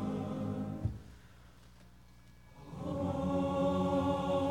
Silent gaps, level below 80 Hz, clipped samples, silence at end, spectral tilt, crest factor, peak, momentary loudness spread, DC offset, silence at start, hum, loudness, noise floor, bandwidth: none; -54 dBFS; under 0.1%; 0 s; -8 dB/octave; 16 dB; -20 dBFS; 18 LU; under 0.1%; 0 s; 60 Hz at -60 dBFS; -35 LUFS; -59 dBFS; 15.5 kHz